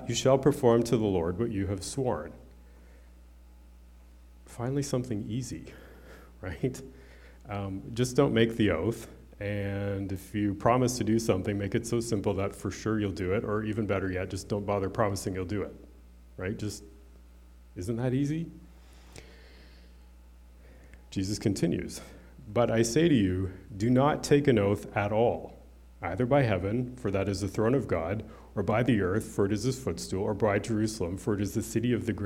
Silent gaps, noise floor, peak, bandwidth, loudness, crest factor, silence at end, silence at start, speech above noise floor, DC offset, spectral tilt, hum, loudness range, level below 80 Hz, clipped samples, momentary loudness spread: none; -53 dBFS; -10 dBFS; 16.5 kHz; -29 LUFS; 20 dB; 0 s; 0 s; 24 dB; under 0.1%; -6 dB/octave; none; 10 LU; -52 dBFS; under 0.1%; 14 LU